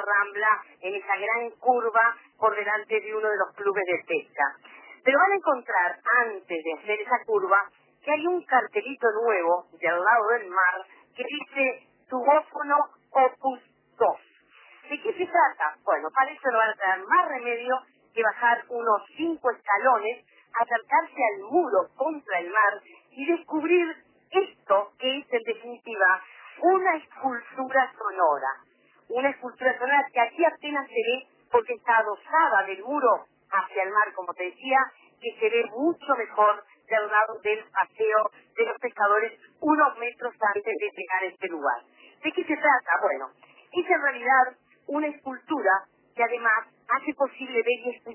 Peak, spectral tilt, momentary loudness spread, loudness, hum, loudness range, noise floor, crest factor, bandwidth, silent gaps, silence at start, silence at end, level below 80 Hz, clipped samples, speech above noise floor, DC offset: -8 dBFS; -6.5 dB/octave; 10 LU; -25 LUFS; none; 2 LU; -55 dBFS; 18 dB; 3.2 kHz; none; 0 s; 0 s; -84 dBFS; under 0.1%; 30 dB; under 0.1%